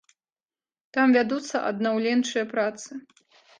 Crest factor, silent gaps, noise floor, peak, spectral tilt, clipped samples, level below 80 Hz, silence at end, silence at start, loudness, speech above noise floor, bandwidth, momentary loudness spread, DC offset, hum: 18 dB; none; under -90 dBFS; -10 dBFS; -4 dB/octave; under 0.1%; -76 dBFS; 0.6 s; 0.95 s; -24 LUFS; over 66 dB; 9.6 kHz; 16 LU; under 0.1%; none